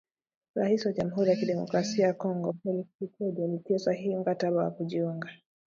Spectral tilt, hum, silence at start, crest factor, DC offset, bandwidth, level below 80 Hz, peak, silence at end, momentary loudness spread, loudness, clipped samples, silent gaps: -6.5 dB/octave; none; 0.55 s; 18 dB; under 0.1%; 7.6 kHz; -72 dBFS; -12 dBFS; 0.3 s; 8 LU; -30 LUFS; under 0.1%; 2.95-2.99 s